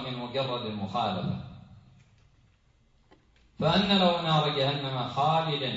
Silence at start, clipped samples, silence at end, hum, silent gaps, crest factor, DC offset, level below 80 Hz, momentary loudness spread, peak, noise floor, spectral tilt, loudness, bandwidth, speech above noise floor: 0 s; under 0.1%; 0 s; none; none; 20 dB; under 0.1%; -58 dBFS; 10 LU; -10 dBFS; -64 dBFS; -6.5 dB/octave; -27 LUFS; 7.8 kHz; 37 dB